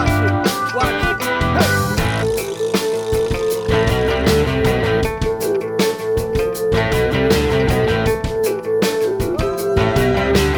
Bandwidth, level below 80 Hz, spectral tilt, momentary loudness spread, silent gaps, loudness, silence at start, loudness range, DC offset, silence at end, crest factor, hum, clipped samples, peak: over 20 kHz; -28 dBFS; -5.5 dB/octave; 4 LU; none; -17 LUFS; 0 s; 0 LU; under 0.1%; 0 s; 16 dB; none; under 0.1%; -2 dBFS